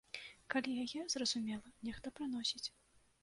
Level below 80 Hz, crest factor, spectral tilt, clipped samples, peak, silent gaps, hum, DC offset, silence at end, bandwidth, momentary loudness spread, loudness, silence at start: -70 dBFS; 22 dB; -2 dB/octave; under 0.1%; -20 dBFS; none; none; under 0.1%; 0.55 s; 11.5 kHz; 10 LU; -41 LUFS; 0.15 s